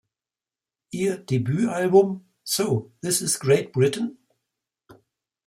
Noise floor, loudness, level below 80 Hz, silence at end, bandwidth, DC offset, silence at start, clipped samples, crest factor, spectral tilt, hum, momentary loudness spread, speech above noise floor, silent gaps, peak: under -90 dBFS; -23 LUFS; -66 dBFS; 0.55 s; 16 kHz; under 0.1%; 0.95 s; under 0.1%; 20 dB; -5 dB/octave; none; 11 LU; over 68 dB; none; -6 dBFS